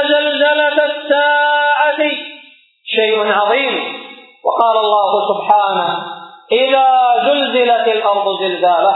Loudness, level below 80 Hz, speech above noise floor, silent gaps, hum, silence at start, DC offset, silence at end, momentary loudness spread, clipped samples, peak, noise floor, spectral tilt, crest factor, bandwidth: -13 LUFS; -84 dBFS; 31 dB; none; none; 0 s; under 0.1%; 0 s; 10 LU; under 0.1%; 0 dBFS; -44 dBFS; -5.5 dB/octave; 14 dB; 4.1 kHz